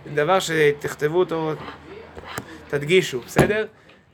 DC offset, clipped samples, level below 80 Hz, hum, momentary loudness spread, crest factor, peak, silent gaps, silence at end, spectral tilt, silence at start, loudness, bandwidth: under 0.1%; under 0.1%; -48 dBFS; none; 16 LU; 22 dB; 0 dBFS; none; 0.45 s; -5 dB/octave; 0 s; -21 LUFS; 18.5 kHz